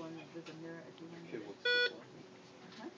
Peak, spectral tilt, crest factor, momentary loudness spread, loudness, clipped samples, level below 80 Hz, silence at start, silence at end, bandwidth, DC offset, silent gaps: -24 dBFS; -3.5 dB/octave; 18 dB; 23 LU; -38 LUFS; under 0.1%; -88 dBFS; 0 s; 0 s; 7.8 kHz; under 0.1%; none